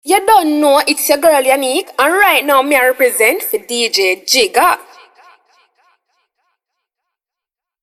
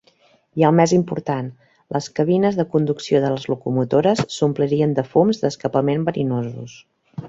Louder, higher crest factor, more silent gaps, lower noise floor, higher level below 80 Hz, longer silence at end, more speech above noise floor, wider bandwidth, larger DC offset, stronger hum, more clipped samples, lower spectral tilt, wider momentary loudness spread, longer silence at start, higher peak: first, -11 LUFS vs -19 LUFS; about the same, 14 dB vs 18 dB; neither; first, -86 dBFS vs -57 dBFS; about the same, -56 dBFS vs -58 dBFS; first, 3 s vs 0 s; first, 74 dB vs 38 dB; first, 16.5 kHz vs 8 kHz; neither; neither; neither; second, 0 dB/octave vs -7 dB/octave; second, 5 LU vs 10 LU; second, 0.05 s vs 0.55 s; about the same, 0 dBFS vs -2 dBFS